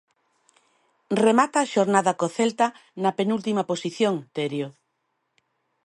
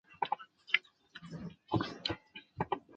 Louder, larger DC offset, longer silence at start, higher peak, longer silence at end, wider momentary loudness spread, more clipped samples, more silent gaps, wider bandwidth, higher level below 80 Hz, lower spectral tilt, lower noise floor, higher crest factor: first, -23 LUFS vs -38 LUFS; neither; first, 1.1 s vs 0.1 s; first, -4 dBFS vs -12 dBFS; first, 1.15 s vs 0 s; second, 9 LU vs 17 LU; neither; neither; first, 11.5 kHz vs 8.6 kHz; second, -74 dBFS vs -62 dBFS; about the same, -5 dB/octave vs -5.5 dB/octave; first, -75 dBFS vs -55 dBFS; second, 20 dB vs 28 dB